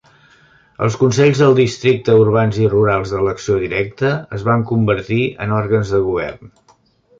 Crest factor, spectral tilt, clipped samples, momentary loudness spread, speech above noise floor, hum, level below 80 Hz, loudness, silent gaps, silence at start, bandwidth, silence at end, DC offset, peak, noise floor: 14 dB; -7 dB/octave; under 0.1%; 8 LU; 39 dB; none; -44 dBFS; -16 LUFS; none; 0.8 s; 7.8 kHz; 0.75 s; under 0.1%; -2 dBFS; -54 dBFS